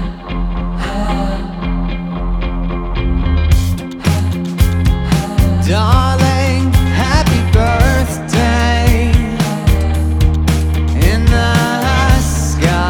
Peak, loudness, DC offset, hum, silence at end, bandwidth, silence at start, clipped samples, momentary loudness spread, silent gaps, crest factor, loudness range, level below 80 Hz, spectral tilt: 0 dBFS; -14 LUFS; under 0.1%; none; 0 s; 18 kHz; 0 s; under 0.1%; 8 LU; none; 12 dB; 5 LU; -16 dBFS; -6 dB/octave